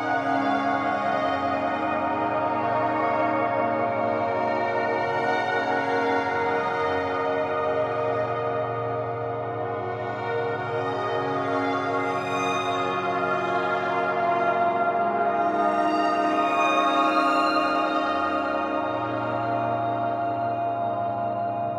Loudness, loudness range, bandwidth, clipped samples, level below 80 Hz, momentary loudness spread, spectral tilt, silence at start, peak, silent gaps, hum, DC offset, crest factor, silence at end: -25 LUFS; 5 LU; 10 kHz; under 0.1%; -68 dBFS; 5 LU; -6 dB/octave; 0 s; -8 dBFS; none; none; under 0.1%; 16 dB; 0 s